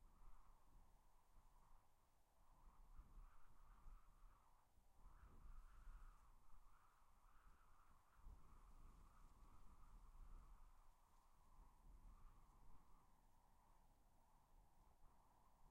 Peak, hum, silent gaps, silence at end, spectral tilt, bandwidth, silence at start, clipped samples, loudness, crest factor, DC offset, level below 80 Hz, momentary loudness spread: -52 dBFS; none; none; 0 s; -5 dB/octave; 16 kHz; 0 s; under 0.1%; -69 LUFS; 14 dB; under 0.1%; -68 dBFS; 1 LU